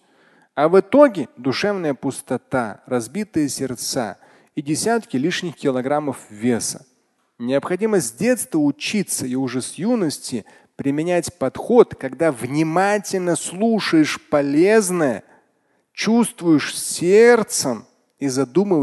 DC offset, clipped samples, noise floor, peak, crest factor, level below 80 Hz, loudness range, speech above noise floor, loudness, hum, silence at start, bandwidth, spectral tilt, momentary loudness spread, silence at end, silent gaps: under 0.1%; under 0.1%; -65 dBFS; 0 dBFS; 20 dB; -60 dBFS; 5 LU; 46 dB; -19 LUFS; none; 0.55 s; 12.5 kHz; -4.5 dB/octave; 11 LU; 0 s; none